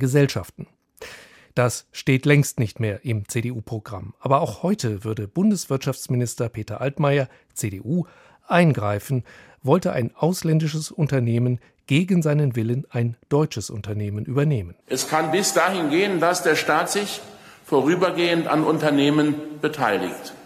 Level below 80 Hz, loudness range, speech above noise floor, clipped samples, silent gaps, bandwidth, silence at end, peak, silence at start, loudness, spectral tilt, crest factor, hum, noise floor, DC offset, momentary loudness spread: -58 dBFS; 3 LU; 23 dB; under 0.1%; none; 16 kHz; 0 s; -2 dBFS; 0 s; -22 LUFS; -5.5 dB/octave; 20 dB; none; -45 dBFS; under 0.1%; 11 LU